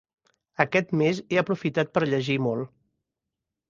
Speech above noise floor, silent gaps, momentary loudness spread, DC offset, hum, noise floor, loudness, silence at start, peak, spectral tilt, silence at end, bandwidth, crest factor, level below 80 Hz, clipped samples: 61 dB; none; 8 LU; under 0.1%; none; -86 dBFS; -25 LUFS; 0.6 s; -2 dBFS; -6.5 dB/octave; 1.05 s; 7.6 kHz; 24 dB; -64 dBFS; under 0.1%